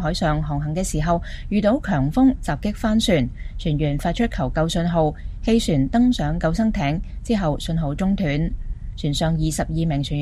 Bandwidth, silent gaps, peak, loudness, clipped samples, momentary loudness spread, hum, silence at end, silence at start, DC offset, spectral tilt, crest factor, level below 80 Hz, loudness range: 15 kHz; none; -4 dBFS; -22 LUFS; under 0.1%; 7 LU; none; 0 s; 0 s; under 0.1%; -6 dB/octave; 16 dB; -30 dBFS; 2 LU